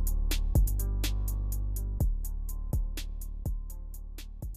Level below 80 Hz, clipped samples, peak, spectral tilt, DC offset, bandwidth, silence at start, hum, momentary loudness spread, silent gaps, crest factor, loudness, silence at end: -30 dBFS; under 0.1%; -16 dBFS; -5 dB/octave; under 0.1%; 15.5 kHz; 0 s; none; 15 LU; none; 14 dB; -34 LUFS; 0 s